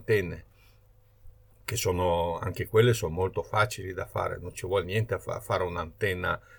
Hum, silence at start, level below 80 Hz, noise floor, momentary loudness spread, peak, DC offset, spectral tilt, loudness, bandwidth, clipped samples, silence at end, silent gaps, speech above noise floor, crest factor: none; 0 s; -50 dBFS; -59 dBFS; 10 LU; -10 dBFS; under 0.1%; -5 dB/octave; -29 LUFS; over 20 kHz; under 0.1%; 0 s; none; 31 dB; 20 dB